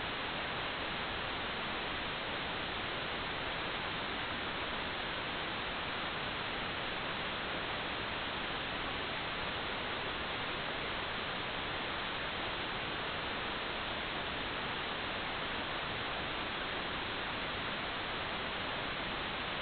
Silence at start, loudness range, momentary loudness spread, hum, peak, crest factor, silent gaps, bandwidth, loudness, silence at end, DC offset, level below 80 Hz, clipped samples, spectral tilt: 0 s; 0 LU; 0 LU; none; -24 dBFS; 14 dB; none; 4.9 kHz; -37 LUFS; 0 s; under 0.1%; -56 dBFS; under 0.1%; -1 dB/octave